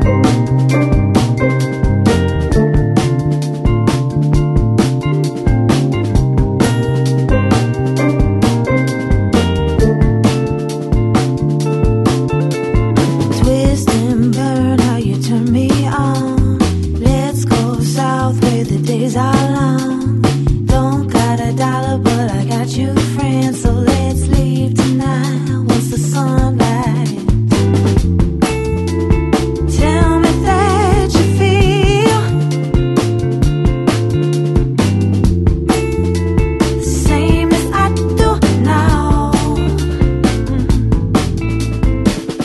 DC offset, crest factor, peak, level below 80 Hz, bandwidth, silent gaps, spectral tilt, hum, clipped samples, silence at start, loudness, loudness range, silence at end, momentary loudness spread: under 0.1%; 12 dB; 0 dBFS; -22 dBFS; 12.5 kHz; none; -6.5 dB/octave; none; under 0.1%; 0 s; -14 LUFS; 2 LU; 0 s; 4 LU